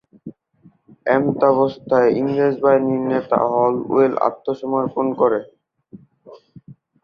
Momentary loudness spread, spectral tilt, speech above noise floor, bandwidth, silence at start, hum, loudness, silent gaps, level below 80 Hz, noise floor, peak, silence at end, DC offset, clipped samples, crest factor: 6 LU; -9 dB/octave; 36 dB; 6.2 kHz; 0.25 s; none; -18 LUFS; none; -62 dBFS; -53 dBFS; -2 dBFS; 0.3 s; under 0.1%; under 0.1%; 18 dB